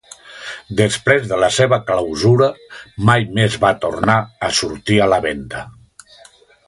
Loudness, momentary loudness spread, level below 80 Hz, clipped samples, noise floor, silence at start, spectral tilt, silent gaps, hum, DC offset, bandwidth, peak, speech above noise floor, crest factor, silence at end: -16 LUFS; 17 LU; -44 dBFS; under 0.1%; -47 dBFS; 0.25 s; -5 dB/octave; none; none; under 0.1%; 11.5 kHz; 0 dBFS; 31 dB; 18 dB; 0.95 s